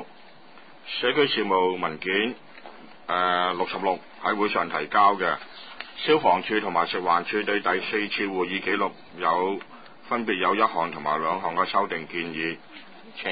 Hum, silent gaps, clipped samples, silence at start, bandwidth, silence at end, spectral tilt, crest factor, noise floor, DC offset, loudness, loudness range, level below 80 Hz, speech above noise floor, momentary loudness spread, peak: none; none; under 0.1%; 0 s; 5 kHz; 0 s; -8.5 dB/octave; 18 dB; -51 dBFS; 0.3%; -25 LUFS; 3 LU; -68 dBFS; 26 dB; 17 LU; -8 dBFS